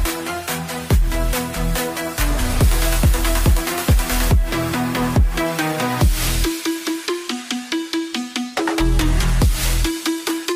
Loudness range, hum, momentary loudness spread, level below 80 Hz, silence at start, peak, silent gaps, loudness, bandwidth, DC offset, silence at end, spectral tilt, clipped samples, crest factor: 3 LU; none; 6 LU; -20 dBFS; 0 s; -4 dBFS; none; -20 LUFS; 16 kHz; under 0.1%; 0 s; -4.5 dB/octave; under 0.1%; 14 dB